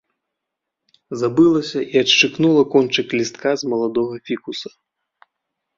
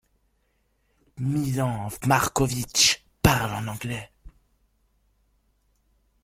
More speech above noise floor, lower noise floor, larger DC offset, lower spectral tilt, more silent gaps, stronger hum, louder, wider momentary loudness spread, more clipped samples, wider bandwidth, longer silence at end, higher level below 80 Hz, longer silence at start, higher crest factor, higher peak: first, 64 dB vs 45 dB; first, -81 dBFS vs -70 dBFS; neither; about the same, -4.5 dB/octave vs -3.5 dB/octave; neither; neither; first, -17 LUFS vs -24 LUFS; about the same, 14 LU vs 13 LU; neither; second, 7.6 kHz vs 16.5 kHz; second, 1.1 s vs 1.95 s; second, -62 dBFS vs -46 dBFS; about the same, 1.1 s vs 1.15 s; second, 18 dB vs 26 dB; about the same, -2 dBFS vs -2 dBFS